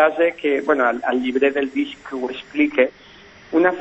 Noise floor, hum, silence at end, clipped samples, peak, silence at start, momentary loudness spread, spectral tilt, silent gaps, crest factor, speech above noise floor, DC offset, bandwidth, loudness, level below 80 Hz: -45 dBFS; none; 0 s; under 0.1%; -2 dBFS; 0 s; 9 LU; -5.5 dB/octave; none; 18 dB; 26 dB; under 0.1%; 8 kHz; -20 LUFS; -58 dBFS